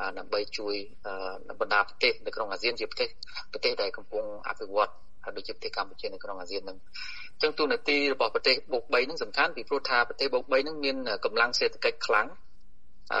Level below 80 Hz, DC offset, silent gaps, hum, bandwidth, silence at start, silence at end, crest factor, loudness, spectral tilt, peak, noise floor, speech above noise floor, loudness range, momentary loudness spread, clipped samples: -60 dBFS; 1%; none; none; 9.4 kHz; 0 s; 0 s; 22 dB; -29 LUFS; -2.5 dB/octave; -8 dBFS; -59 dBFS; 29 dB; 6 LU; 13 LU; under 0.1%